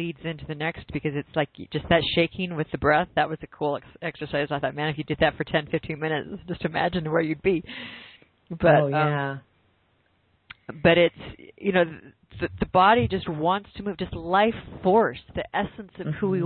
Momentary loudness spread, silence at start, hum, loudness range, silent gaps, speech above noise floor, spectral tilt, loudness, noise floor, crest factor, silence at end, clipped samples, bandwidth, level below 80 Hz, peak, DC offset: 14 LU; 0 s; none; 4 LU; none; 42 dB; -10.5 dB/octave; -25 LUFS; -66 dBFS; 18 dB; 0 s; under 0.1%; 4.6 kHz; -50 dBFS; -6 dBFS; under 0.1%